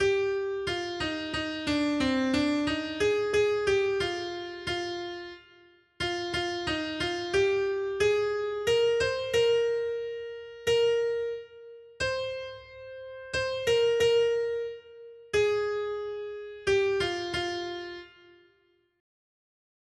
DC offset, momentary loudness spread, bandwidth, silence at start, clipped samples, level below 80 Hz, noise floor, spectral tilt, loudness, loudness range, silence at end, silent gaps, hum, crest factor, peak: under 0.1%; 14 LU; 12.5 kHz; 0 s; under 0.1%; -56 dBFS; -68 dBFS; -4 dB/octave; -28 LUFS; 5 LU; 1.9 s; none; none; 14 dB; -14 dBFS